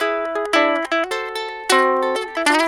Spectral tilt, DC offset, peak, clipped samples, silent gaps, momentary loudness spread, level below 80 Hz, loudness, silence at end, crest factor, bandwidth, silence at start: -0.5 dB/octave; under 0.1%; 0 dBFS; under 0.1%; none; 8 LU; -58 dBFS; -19 LUFS; 0 s; 18 dB; 18 kHz; 0 s